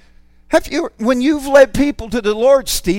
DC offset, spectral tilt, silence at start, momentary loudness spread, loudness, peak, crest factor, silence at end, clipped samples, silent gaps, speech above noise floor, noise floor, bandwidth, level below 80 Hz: under 0.1%; -4 dB/octave; 0.5 s; 8 LU; -14 LUFS; 0 dBFS; 14 dB; 0 s; under 0.1%; none; 32 dB; -46 dBFS; 17 kHz; -34 dBFS